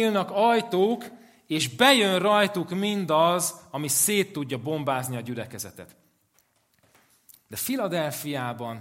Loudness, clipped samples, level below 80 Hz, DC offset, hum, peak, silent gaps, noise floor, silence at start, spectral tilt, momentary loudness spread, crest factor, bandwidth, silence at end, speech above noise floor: -24 LUFS; under 0.1%; -72 dBFS; under 0.1%; none; -4 dBFS; none; -67 dBFS; 0 s; -3.5 dB/octave; 13 LU; 22 dB; 16.5 kHz; 0 s; 42 dB